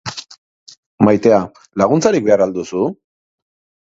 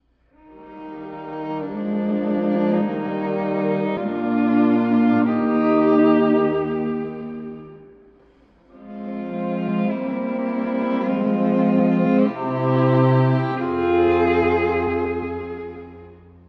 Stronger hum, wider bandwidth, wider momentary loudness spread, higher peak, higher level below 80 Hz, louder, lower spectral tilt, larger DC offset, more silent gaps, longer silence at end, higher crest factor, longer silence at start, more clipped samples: neither; first, 7.8 kHz vs 5.6 kHz; second, 12 LU vs 16 LU; first, 0 dBFS vs -6 dBFS; about the same, -52 dBFS vs -52 dBFS; first, -15 LUFS vs -20 LUFS; second, -6 dB/octave vs -10 dB/octave; neither; first, 0.38-0.66 s, 0.77-0.98 s vs none; first, 0.95 s vs 0.3 s; about the same, 16 dB vs 16 dB; second, 0.05 s vs 0.5 s; neither